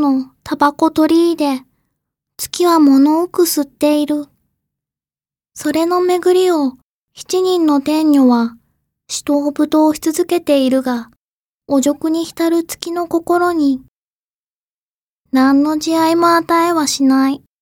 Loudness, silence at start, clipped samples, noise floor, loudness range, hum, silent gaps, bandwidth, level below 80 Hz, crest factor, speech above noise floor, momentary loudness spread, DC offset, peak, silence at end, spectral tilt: -15 LUFS; 0 s; under 0.1%; under -90 dBFS; 3 LU; none; 6.83-7.08 s, 11.17-11.58 s, 13.88-15.25 s; 17.5 kHz; -56 dBFS; 14 dB; over 76 dB; 10 LU; under 0.1%; 0 dBFS; 0.25 s; -3.5 dB/octave